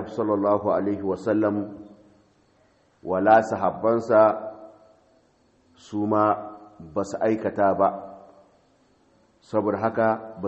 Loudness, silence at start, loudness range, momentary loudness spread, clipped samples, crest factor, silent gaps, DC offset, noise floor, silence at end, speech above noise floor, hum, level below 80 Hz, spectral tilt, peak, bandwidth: -23 LUFS; 0 s; 4 LU; 19 LU; under 0.1%; 22 dB; none; under 0.1%; -62 dBFS; 0 s; 40 dB; none; -66 dBFS; -7.5 dB/octave; -4 dBFS; 8.4 kHz